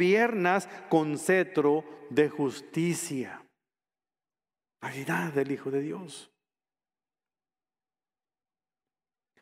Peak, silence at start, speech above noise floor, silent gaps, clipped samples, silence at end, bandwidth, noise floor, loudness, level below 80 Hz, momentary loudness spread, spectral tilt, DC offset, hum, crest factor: -10 dBFS; 0 s; over 62 dB; none; under 0.1%; 3.2 s; 16 kHz; under -90 dBFS; -28 LUFS; -78 dBFS; 16 LU; -5.5 dB/octave; under 0.1%; none; 20 dB